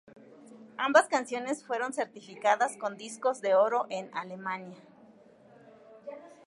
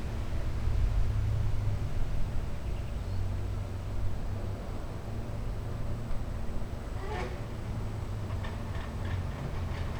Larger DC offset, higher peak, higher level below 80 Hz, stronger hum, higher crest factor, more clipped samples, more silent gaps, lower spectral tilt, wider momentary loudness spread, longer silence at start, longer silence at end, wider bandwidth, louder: neither; first, -8 dBFS vs -18 dBFS; second, -88 dBFS vs -36 dBFS; neither; first, 24 dB vs 14 dB; neither; neither; second, -3 dB/octave vs -7 dB/octave; first, 22 LU vs 7 LU; first, 0.45 s vs 0 s; first, 0.15 s vs 0 s; about the same, 11.5 kHz vs 12.5 kHz; first, -30 LUFS vs -36 LUFS